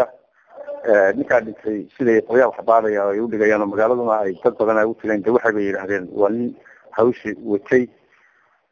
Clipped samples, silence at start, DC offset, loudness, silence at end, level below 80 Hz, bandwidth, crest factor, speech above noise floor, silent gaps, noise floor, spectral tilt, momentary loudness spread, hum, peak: under 0.1%; 0 s; under 0.1%; -19 LUFS; 0.85 s; -60 dBFS; 7 kHz; 18 dB; 40 dB; none; -58 dBFS; -7.5 dB/octave; 11 LU; none; -2 dBFS